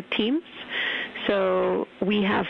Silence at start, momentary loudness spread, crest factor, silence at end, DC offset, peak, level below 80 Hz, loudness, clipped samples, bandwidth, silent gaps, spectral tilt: 0 s; 5 LU; 16 dB; 0 s; under 0.1%; -10 dBFS; -60 dBFS; -25 LUFS; under 0.1%; 6 kHz; none; -7.5 dB/octave